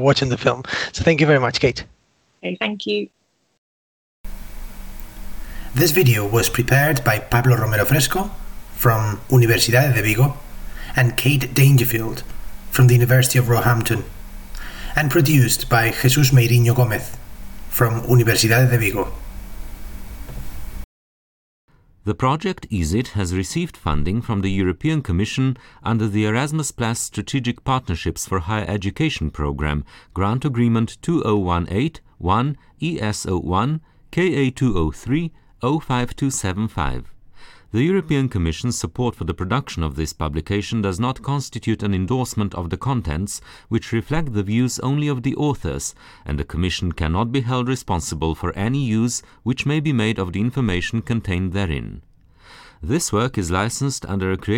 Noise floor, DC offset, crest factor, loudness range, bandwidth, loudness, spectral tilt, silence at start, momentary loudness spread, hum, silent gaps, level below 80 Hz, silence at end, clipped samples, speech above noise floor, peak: -61 dBFS; under 0.1%; 16 dB; 7 LU; 19.5 kHz; -20 LUFS; -5.5 dB/octave; 0 s; 19 LU; none; 3.58-4.24 s, 20.84-21.68 s; -36 dBFS; 0 s; under 0.1%; 42 dB; -4 dBFS